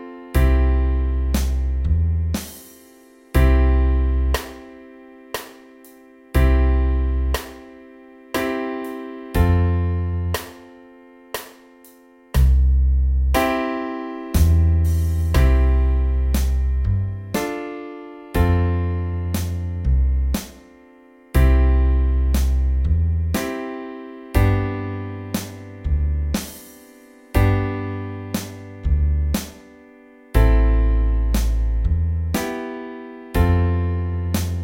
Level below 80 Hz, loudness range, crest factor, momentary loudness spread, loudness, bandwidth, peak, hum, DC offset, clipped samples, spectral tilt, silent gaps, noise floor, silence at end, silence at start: -22 dBFS; 5 LU; 18 dB; 15 LU; -21 LUFS; 17 kHz; -2 dBFS; none; under 0.1%; under 0.1%; -6.5 dB/octave; none; -49 dBFS; 0 s; 0 s